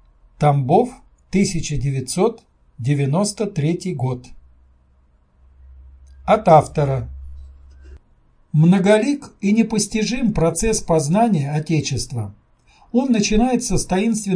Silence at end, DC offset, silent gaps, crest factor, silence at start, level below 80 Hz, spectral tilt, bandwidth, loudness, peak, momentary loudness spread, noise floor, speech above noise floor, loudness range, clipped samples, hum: 0 s; under 0.1%; none; 20 dB; 0.4 s; -36 dBFS; -6 dB/octave; 10.5 kHz; -19 LUFS; 0 dBFS; 11 LU; -56 dBFS; 38 dB; 6 LU; under 0.1%; none